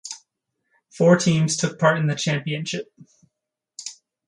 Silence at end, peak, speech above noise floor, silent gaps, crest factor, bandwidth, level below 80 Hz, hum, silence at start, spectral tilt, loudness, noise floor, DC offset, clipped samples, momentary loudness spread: 0.35 s; -2 dBFS; 63 dB; none; 20 dB; 11 kHz; -64 dBFS; none; 0.05 s; -5 dB/octave; -21 LUFS; -83 dBFS; under 0.1%; under 0.1%; 20 LU